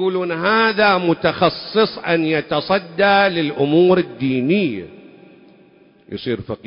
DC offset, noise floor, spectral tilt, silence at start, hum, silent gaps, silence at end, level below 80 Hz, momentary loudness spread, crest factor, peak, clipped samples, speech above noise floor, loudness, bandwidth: under 0.1%; -50 dBFS; -10.5 dB/octave; 0 s; none; none; 0.1 s; -54 dBFS; 10 LU; 16 dB; -2 dBFS; under 0.1%; 33 dB; -17 LUFS; 5.4 kHz